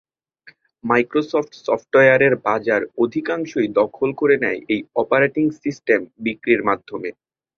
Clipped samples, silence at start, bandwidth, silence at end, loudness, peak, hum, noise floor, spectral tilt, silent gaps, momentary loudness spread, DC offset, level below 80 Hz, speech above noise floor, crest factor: under 0.1%; 0.45 s; 6.8 kHz; 0.45 s; -19 LUFS; -2 dBFS; none; -51 dBFS; -6.5 dB/octave; none; 10 LU; under 0.1%; -62 dBFS; 33 dB; 18 dB